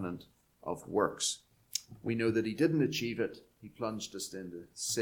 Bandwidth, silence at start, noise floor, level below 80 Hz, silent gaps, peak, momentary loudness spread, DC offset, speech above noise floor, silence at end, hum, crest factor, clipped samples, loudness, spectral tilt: 19 kHz; 0 s; -57 dBFS; -68 dBFS; none; -12 dBFS; 15 LU; under 0.1%; 23 dB; 0 s; none; 22 dB; under 0.1%; -35 LUFS; -4 dB/octave